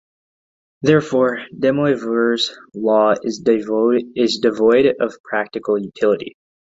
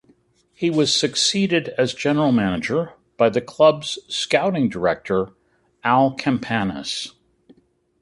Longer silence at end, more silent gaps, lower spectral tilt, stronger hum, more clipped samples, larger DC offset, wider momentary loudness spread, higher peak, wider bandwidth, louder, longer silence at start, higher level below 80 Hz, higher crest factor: second, 0.45 s vs 0.9 s; first, 5.20-5.24 s vs none; about the same, -5.5 dB/octave vs -4.5 dB/octave; neither; neither; neither; about the same, 8 LU vs 10 LU; about the same, -2 dBFS vs -2 dBFS; second, 7.8 kHz vs 11.5 kHz; about the same, -18 LUFS vs -20 LUFS; first, 0.8 s vs 0.6 s; about the same, -58 dBFS vs -54 dBFS; about the same, 16 dB vs 20 dB